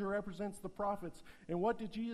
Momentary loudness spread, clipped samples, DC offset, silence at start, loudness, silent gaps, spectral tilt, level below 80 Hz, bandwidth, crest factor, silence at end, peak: 9 LU; under 0.1%; under 0.1%; 0 s; -40 LUFS; none; -6.5 dB/octave; -62 dBFS; 14 kHz; 14 dB; 0 s; -26 dBFS